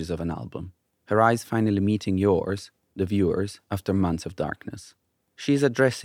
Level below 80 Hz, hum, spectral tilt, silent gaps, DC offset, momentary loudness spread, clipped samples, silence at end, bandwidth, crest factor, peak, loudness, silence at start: -56 dBFS; none; -6.5 dB/octave; none; under 0.1%; 16 LU; under 0.1%; 0 s; 16 kHz; 20 dB; -4 dBFS; -25 LUFS; 0 s